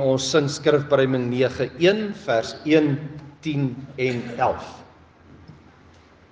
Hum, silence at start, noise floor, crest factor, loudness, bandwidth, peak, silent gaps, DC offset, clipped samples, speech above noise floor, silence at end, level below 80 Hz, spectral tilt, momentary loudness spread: none; 0 s; -51 dBFS; 18 dB; -22 LUFS; 9.8 kHz; -6 dBFS; none; under 0.1%; under 0.1%; 29 dB; 0.8 s; -60 dBFS; -5.5 dB/octave; 10 LU